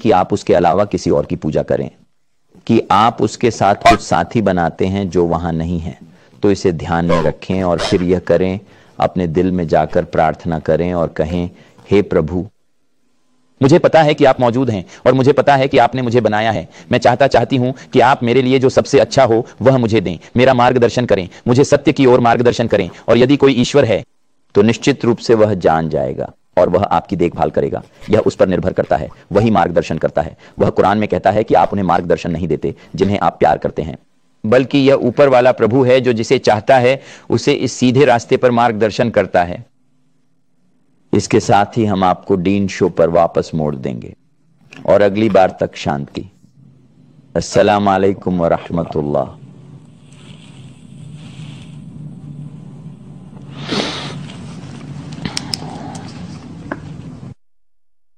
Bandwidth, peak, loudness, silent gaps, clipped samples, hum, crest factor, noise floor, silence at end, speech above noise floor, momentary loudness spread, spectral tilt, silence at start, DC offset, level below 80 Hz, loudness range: 10.5 kHz; 0 dBFS; -14 LUFS; none; under 0.1%; none; 14 dB; -78 dBFS; 0.85 s; 64 dB; 17 LU; -6.5 dB/octave; 0 s; 0.2%; -42 dBFS; 12 LU